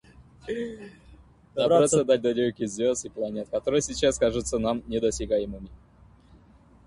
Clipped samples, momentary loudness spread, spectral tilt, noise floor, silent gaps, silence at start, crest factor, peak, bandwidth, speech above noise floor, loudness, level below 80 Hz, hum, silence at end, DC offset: under 0.1%; 16 LU; -4.5 dB/octave; -55 dBFS; none; 0.2 s; 18 dB; -8 dBFS; 11.5 kHz; 30 dB; -26 LUFS; -48 dBFS; none; 1.1 s; under 0.1%